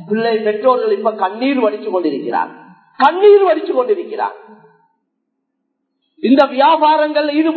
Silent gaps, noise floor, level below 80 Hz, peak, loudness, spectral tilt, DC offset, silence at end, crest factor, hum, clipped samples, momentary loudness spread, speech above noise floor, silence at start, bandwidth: none; -72 dBFS; -70 dBFS; 0 dBFS; -14 LUFS; -7 dB/octave; under 0.1%; 0 s; 14 dB; none; under 0.1%; 10 LU; 58 dB; 0 s; 4.6 kHz